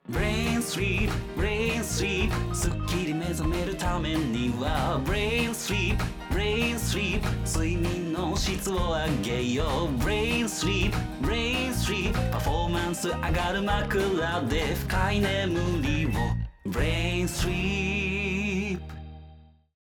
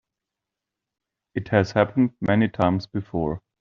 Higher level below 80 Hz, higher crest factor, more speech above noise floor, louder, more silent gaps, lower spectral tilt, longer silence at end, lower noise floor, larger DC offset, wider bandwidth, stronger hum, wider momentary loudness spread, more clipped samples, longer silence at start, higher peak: first, -34 dBFS vs -54 dBFS; second, 12 dB vs 22 dB; second, 25 dB vs 64 dB; second, -27 LUFS vs -23 LUFS; neither; second, -5 dB/octave vs -6.5 dB/octave; first, 0.4 s vs 0.25 s; second, -52 dBFS vs -86 dBFS; neither; first, over 20 kHz vs 7.2 kHz; neither; second, 3 LU vs 9 LU; neither; second, 0.05 s vs 1.35 s; second, -14 dBFS vs -4 dBFS